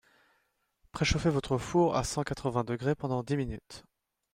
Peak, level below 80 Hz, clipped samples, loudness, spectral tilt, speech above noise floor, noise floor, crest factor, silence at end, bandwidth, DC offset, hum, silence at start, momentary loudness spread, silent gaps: -12 dBFS; -48 dBFS; under 0.1%; -31 LUFS; -5.5 dB/octave; 45 dB; -75 dBFS; 20 dB; 0.55 s; 15.5 kHz; under 0.1%; none; 0.95 s; 16 LU; none